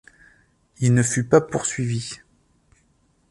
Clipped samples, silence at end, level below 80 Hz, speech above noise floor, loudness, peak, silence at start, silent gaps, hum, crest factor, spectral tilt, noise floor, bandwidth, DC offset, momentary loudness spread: under 0.1%; 1.15 s; -56 dBFS; 43 dB; -21 LUFS; -4 dBFS; 0.8 s; none; none; 20 dB; -5.5 dB/octave; -63 dBFS; 11.5 kHz; under 0.1%; 13 LU